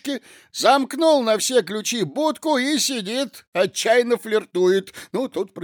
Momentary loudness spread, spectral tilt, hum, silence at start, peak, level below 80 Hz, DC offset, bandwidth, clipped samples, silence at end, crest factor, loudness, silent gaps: 9 LU; -3 dB/octave; none; 0.05 s; -4 dBFS; -76 dBFS; under 0.1%; over 20 kHz; under 0.1%; 0 s; 18 dB; -20 LUFS; 3.47-3.53 s